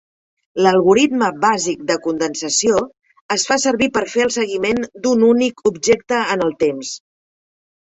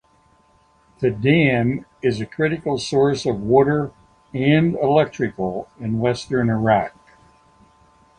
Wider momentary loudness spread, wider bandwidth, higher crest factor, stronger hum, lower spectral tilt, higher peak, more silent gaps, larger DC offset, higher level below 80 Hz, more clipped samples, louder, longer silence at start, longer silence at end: second, 7 LU vs 10 LU; second, 8.4 kHz vs 9.8 kHz; about the same, 16 dB vs 18 dB; neither; second, -3.5 dB/octave vs -7 dB/octave; about the same, -2 dBFS vs -2 dBFS; first, 3.21-3.29 s vs none; neither; about the same, -54 dBFS vs -50 dBFS; neither; first, -17 LUFS vs -20 LUFS; second, 0.55 s vs 1 s; second, 0.85 s vs 1.3 s